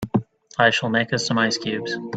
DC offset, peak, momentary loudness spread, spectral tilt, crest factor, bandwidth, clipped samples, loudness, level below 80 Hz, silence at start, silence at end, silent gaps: under 0.1%; -2 dBFS; 8 LU; -4 dB/octave; 20 dB; 9.2 kHz; under 0.1%; -21 LUFS; -56 dBFS; 0 s; 0 s; none